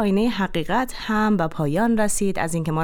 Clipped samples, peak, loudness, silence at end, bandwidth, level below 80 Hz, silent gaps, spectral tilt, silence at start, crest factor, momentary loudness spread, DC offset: under 0.1%; -10 dBFS; -22 LUFS; 0 s; 18.5 kHz; -40 dBFS; none; -5.5 dB/octave; 0 s; 12 dB; 4 LU; under 0.1%